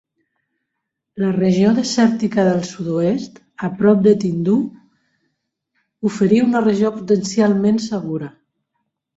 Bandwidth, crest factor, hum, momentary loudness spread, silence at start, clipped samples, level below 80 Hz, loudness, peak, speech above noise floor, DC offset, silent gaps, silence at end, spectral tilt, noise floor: 8 kHz; 16 dB; none; 12 LU; 1.15 s; under 0.1%; -58 dBFS; -17 LUFS; -2 dBFS; 62 dB; under 0.1%; none; 0.9 s; -6.5 dB/octave; -78 dBFS